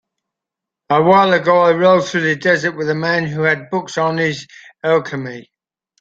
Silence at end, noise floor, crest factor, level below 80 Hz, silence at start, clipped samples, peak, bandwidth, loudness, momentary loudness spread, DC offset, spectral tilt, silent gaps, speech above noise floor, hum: 0.6 s; -84 dBFS; 14 dB; -60 dBFS; 0.9 s; under 0.1%; -2 dBFS; 7.8 kHz; -15 LUFS; 13 LU; under 0.1%; -5.5 dB/octave; none; 69 dB; none